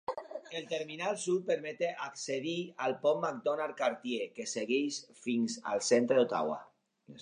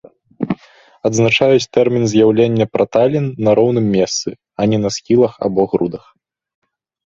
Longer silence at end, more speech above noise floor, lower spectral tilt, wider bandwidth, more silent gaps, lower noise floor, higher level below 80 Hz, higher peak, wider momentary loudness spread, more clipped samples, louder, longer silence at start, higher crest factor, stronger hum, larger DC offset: second, 0 s vs 1.15 s; second, 24 dB vs 33 dB; second, -3.5 dB/octave vs -5.5 dB/octave; first, 10.5 kHz vs 7.8 kHz; neither; first, -57 dBFS vs -47 dBFS; second, -84 dBFS vs -52 dBFS; second, -16 dBFS vs 0 dBFS; about the same, 10 LU vs 11 LU; neither; second, -34 LUFS vs -15 LUFS; second, 0.1 s vs 0.4 s; about the same, 18 dB vs 14 dB; neither; neither